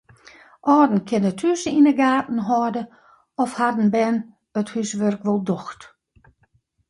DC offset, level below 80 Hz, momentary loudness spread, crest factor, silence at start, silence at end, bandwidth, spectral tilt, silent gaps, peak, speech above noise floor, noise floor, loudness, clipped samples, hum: under 0.1%; -64 dBFS; 12 LU; 16 dB; 0.65 s; 1.05 s; 11.5 kHz; -6 dB/octave; none; -4 dBFS; 44 dB; -64 dBFS; -21 LUFS; under 0.1%; none